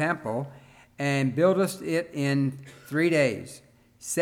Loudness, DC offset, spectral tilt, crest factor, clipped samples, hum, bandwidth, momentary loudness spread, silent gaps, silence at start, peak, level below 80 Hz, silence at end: -26 LUFS; under 0.1%; -5.5 dB/octave; 16 dB; under 0.1%; none; 17 kHz; 17 LU; none; 0 s; -10 dBFS; -68 dBFS; 0 s